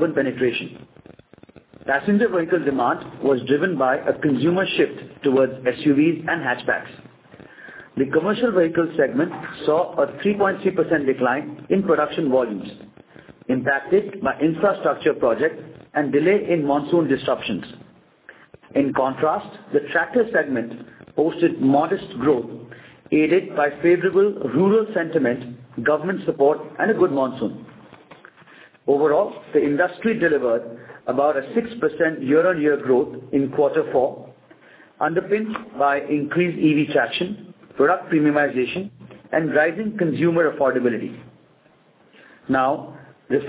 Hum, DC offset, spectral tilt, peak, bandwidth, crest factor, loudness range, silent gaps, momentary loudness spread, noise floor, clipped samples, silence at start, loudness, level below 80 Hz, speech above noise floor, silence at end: none; under 0.1%; -10.5 dB/octave; -4 dBFS; 4 kHz; 16 dB; 3 LU; none; 10 LU; -56 dBFS; under 0.1%; 0 s; -21 LUFS; -60 dBFS; 36 dB; 0 s